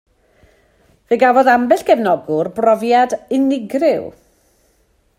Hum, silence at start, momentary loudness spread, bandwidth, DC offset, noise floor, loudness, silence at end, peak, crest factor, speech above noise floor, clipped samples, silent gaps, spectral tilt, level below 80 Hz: none; 1.1 s; 8 LU; 16 kHz; under 0.1%; -59 dBFS; -15 LUFS; 1.1 s; 0 dBFS; 16 dB; 44 dB; under 0.1%; none; -5.5 dB/octave; -58 dBFS